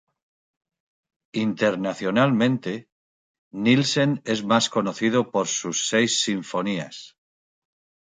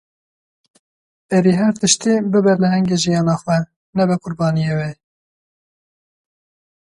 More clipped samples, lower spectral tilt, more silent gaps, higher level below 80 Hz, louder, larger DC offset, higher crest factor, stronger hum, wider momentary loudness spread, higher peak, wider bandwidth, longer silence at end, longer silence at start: neither; about the same, -4 dB/octave vs -5 dB/octave; first, 2.92-3.51 s vs 3.76-3.93 s; second, -68 dBFS vs -54 dBFS; second, -23 LUFS vs -17 LUFS; neither; about the same, 20 dB vs 18 dB; neither; first, 12 LU vs 6 LU; about the same, -4 dBFS vs -2 dBFS; second, 9.6 kHz vs 11.5 kHz; second, 1 s vs 2 s; about the same, 1.35 s vs 1.3 s